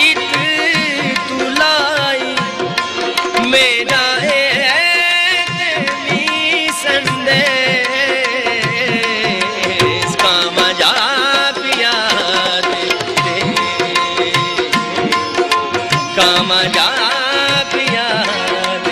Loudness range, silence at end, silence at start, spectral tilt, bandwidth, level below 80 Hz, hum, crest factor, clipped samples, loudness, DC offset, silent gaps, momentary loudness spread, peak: 2 LU; 0 s; 0 s; -2.5 dB/octave; 15.5 kHz; -50 dBFS; none; 14 dB; under 0.1%; -13 LUFS; under 0.1%; none; 5 LU; -2 dBFS